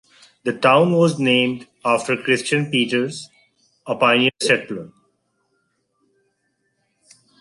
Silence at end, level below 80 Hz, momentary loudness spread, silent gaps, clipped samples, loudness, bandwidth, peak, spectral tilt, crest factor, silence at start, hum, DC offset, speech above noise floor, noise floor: 2.55 s; -66 dBFS; 14 LU; none; under 0.1%; -18 LUFS; 11.5 kHz; -2 dBFS; -4.5 dB/octave; 18 dB; 0.45 s; none; under 0.1%; 52 dB; -70 dBFS